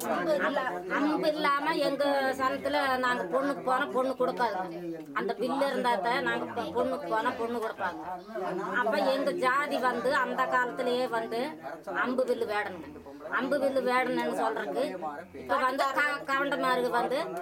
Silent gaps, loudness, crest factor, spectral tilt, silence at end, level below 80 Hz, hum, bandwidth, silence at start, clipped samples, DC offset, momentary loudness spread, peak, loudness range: none; -29 LUFS; 16 dB; -4.5 dB/octave; 0 s; -70 dBFS; none; 16 kHz; 0 s; under 0.1%; under 0.1%; 8 LU; -12 dBFS; 3 LU